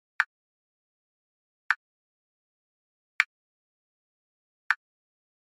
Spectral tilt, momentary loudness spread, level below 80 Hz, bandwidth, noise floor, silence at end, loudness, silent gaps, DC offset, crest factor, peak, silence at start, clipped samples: 7.5 dB/octave; 2 LU; under -90 dBFS; 6.8 kHz; under -90 dBFS; 0.7 s; -30 LUFS; 0.26-1.70 s, 1.76-3.19 s, 3.26-4.70 s; under 0.1%; 34 dB; -2 dBFS; 0.2 s; under 0.1%